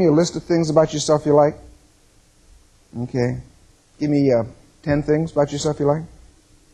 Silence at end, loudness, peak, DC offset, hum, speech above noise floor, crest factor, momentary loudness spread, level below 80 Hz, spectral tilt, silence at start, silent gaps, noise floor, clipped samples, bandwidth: 0.65 s; -19 LUFS; -2 dBFS; under 0.1%; none; 36 dB; 18 dB; 16 LU; -48 dBFS; -6 dB/octave; 0 s; none; -54 dBFS; under 0.1%; 10.5 kHz